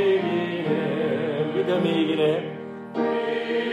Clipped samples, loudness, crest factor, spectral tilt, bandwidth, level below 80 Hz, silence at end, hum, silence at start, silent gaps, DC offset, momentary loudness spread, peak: under 0.1%; -24 LUFS; 14 dB; -7.5 dB/octave; 11 kHz; -70 dBFS; 0 s; none; 0 s; none; under 0.1%; 6 LU; -10 dBFS